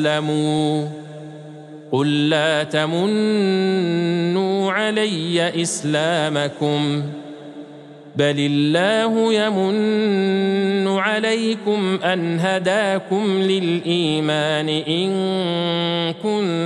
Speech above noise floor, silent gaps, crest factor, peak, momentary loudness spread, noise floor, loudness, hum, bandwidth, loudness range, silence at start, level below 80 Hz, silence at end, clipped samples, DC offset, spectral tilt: 21 dB; none; 16 dB; -4 dBFS; 8 LU; -40 dBFS; -19 LUFS; none; 11.5 kHz; 2 LU; 0 s; -70 dBFS; 0 s; under 0.1%; under 0.1%; -5 dB/octave